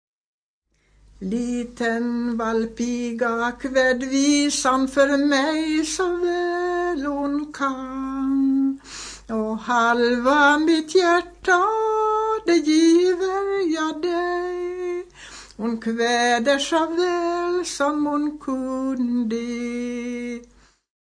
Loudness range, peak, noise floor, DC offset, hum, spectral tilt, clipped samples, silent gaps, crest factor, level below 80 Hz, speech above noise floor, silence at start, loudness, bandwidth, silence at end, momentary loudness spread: 6 LU; -6 dBFS; -58 dBFS; under 0.1%; none; -3 dB/octave; under 0.1%; none; 16 dB; -52 dBFS; 37 dB; 1.2 s; -21 LUFS; 10.5 kHz; 0.55 s; 10 LU